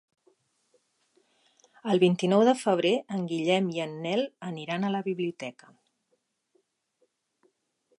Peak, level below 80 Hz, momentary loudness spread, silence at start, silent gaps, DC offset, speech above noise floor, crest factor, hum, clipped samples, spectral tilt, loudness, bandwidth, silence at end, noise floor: -10 dBFS; -80 dBFS; 13 LU; 1.85 s; none; under 0.1%; 49 dB; 20 dB; none; under 0.1%; -6 dB/octave; -27 LUFS; 11.5 kHz; 2.45 s; -76 dBFS